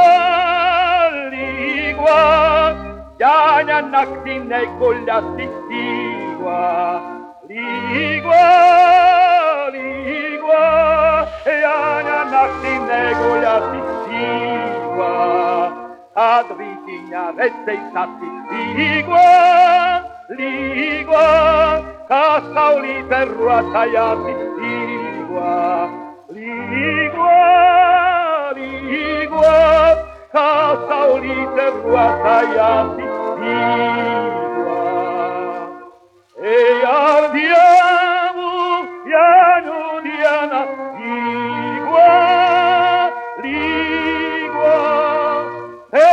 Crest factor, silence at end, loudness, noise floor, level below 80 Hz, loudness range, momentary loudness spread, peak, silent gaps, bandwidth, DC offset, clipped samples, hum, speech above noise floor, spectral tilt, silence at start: 14 dB; 0 s; -15 LUFS; -46 dBFS; -44 dBFS; 6 LU; 14 LU; 0 dBFS; none; 8.2 kHz; under 0.1%; under 0.1%; none; 32 dB; -5.5 dB/octave; 0 s